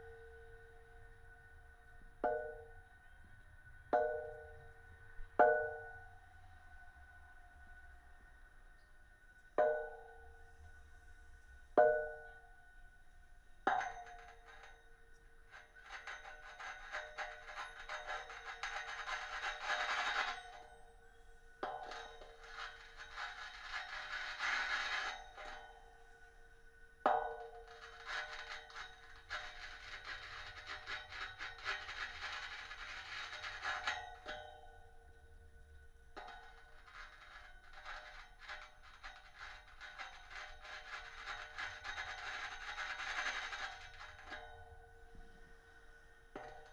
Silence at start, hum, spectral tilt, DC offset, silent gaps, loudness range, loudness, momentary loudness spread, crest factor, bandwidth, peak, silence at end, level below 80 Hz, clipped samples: 0 s; none; -2.5 dB/octave; under 0.1%; none; 13 LU; -42 LUFS; 25 LU; 28 dB; 12 kHz; -16 dBFS; 0 s; -62 dBFS; under 0.1%